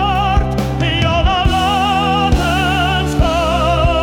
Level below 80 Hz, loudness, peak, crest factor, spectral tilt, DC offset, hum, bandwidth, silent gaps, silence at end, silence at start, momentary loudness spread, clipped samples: -20 dBFS; -14 LUFS; -4 dBFS; 10 dB; -5.5 dB/octave; under 0.1%; none; 17.5 kHz; none; 0 s; 0 s; 2 LU; under 0.1%